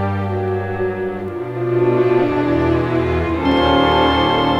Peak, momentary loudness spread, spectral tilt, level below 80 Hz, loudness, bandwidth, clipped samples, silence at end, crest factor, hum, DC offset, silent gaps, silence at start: -2 dBFS; 9 LU; -7.5 dB/octave; -34 dBFS; -17 LUFS; 7.6 kHz; under 0.1%; 0 s; 14 dB; none; under 0.1%; none; 0 s